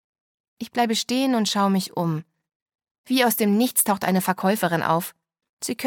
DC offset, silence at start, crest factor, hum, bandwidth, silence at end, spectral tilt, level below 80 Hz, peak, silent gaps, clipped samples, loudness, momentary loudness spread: under 0.1%; 0.6 s; 20 dB; none; 17.5 kHz; 0 s; -4 dB/octave; -70 dBFS; -4 dBFS; 2.55-2.66 s, 2.75-2.79 s, 2.91-3.04 s, 5.49-5.57 s; under 0.1%; -22 LUFS; 11 LU